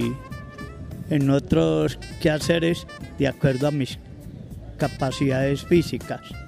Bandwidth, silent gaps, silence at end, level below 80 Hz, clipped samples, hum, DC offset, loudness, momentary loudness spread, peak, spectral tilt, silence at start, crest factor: 15.5 kHz; none; 0 s; -42 dBFS; under 0.1%; none; under 0.1%; -23 LUFS; 17 LU; -6 dBFS; -6.5 dB/octave; 0 s; 18 dB